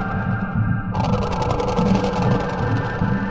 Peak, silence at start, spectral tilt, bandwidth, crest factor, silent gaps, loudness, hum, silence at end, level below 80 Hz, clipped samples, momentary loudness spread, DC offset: -4 dBFS; 0 s; -7.5 dB/octave; 8 kHz; 16 dB; none; -21 LUFS; none; 0 s; -32 dBFS; under 0.1%; 3 LU; under 0.1%